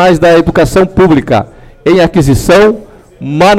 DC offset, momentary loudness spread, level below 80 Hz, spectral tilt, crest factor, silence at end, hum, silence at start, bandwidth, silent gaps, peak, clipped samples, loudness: under 0.1%; 12 LU; -26 dBFS; -6 dB/octave; 6 dB; 0 s; none; 0 s; 16 kHz; none; 0 dBFS; under 0.1%; -8 LUFS